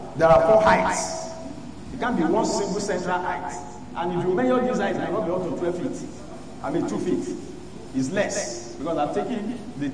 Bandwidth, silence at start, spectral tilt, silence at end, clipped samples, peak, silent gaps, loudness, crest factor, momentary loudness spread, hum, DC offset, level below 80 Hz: 10.5 kHz; 0 s; -5 dB/octave; 0 s; under 0.1%; -6 dBFS; none; -24 LUFS; 18 dB; 18 LU; none; 0.8%; -48 dBFS